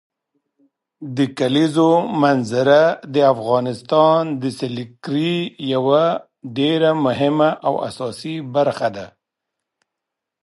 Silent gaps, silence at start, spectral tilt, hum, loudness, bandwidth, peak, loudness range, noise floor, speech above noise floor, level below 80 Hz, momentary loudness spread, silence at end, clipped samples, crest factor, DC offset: none; 1 s; -6.5 dB/octave; none; -18 LUFS; 11.5 kHz; -2 dBFS; 4 LU; -82 dBFS; 65 dB; -64 dBFS; 12 LU; 1.35 s; under 0.1%; 18 dB; under 0.1%